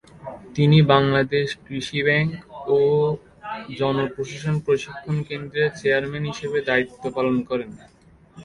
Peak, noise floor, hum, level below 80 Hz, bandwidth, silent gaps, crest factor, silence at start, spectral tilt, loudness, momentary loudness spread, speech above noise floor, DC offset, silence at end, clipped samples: -2 dBFS; -47 dBFS; none; -52 dBFS; 11 kHz; none; 20 dB; 0.2 s; -6.5 dB/octave; -22 LUFS; 15 LU; 26 dB; under 0.1%; 0 s; under 0.1%